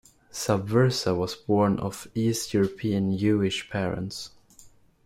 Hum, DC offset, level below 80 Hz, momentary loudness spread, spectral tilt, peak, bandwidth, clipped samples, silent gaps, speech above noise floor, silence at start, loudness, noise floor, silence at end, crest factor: none; under 0.1%; -56 dBFS; 10 LU; -5.5 dB/octave; -10 dBFS; 16.5 kHz; under 0.1%; none; 29 dB; 0.35 s; -26 LUFS; -54 dBFS; 0.4 s; 18 dB